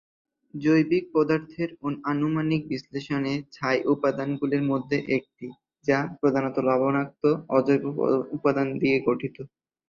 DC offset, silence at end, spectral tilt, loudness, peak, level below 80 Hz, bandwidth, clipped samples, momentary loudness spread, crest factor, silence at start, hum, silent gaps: under 0.1%; 0.45 s; -8 dB/octave; -25 LUFS; -6 dBFS; -64 dBFS; 7.2 kHz; under 0.1%; 10 LU; 18 dB; 0.55 s; none; none